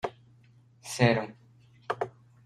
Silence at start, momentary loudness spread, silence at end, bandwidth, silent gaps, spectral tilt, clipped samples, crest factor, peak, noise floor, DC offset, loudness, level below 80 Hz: 0.05 s; 21 LU; 0.35 s; 13.5 kHz; none; -5.5 dB/octave; under 0.1%; 26 dB; -6 dBFS; -59 dBFS; under 0.1%; -30 LUFS; -64 dBFS